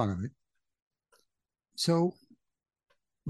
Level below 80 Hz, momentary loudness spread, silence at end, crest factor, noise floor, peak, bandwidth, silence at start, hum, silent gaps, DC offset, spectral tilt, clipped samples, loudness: -68 dBFS; 15 LU; 0 s; 22 dB; -84 dBFS; -14 dBFS; 12 kHz; 0 s; none; 0.82-0.91 s; under 0.1%; -6 dB/octave; under 0.1%; -31 LUFS